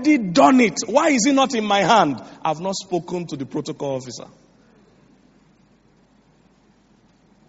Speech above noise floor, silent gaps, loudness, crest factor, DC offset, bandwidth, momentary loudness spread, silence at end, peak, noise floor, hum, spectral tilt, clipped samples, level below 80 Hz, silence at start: 38 dB; none; -19 LUFS; 20 dB; under 0.1%; 8 kHz; 14 LU; 3.3 s; 0 dBFS; -57 dBFS; none; -3.5 dB/octave; under 0.1%; -62 dBFS; 0 s